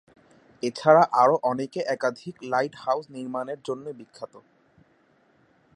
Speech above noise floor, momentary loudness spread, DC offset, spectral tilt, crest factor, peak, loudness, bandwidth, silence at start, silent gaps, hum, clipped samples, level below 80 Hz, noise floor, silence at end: 38 dB; 22 LU; under 0.1%; -5.5 dB/octave; 22 dB; -4 dBFS; -24 LUFS; 11 kHz; 0.65 s; none; none; under 0.1%; -74 dBFS; -63 dBFS; 1.4 s